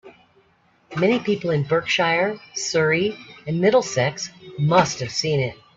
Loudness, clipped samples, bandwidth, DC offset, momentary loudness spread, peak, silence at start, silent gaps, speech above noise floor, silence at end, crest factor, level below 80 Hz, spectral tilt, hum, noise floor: -21 LUFS; under 0.1%; 8 kHz; under 0.1%; 10 LU; -2 dBFS; 0.05 s; none; 39 dB; 0.2 s; 20 dB; -60 dBFS; -4.5 dB/octave; none; -60 dBFS